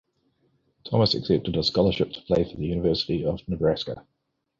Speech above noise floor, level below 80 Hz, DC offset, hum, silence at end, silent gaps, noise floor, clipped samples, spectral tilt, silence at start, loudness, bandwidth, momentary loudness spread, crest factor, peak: 45 dB; -46 dBFS; under 0.1%; none; 0.6 s; none; -69 dBFS; under 0.1%; -7 dB/octave; 0.85 s; -25 LUFS; 7.6 kHz; 7 LU; 18 dB; -8 dBFS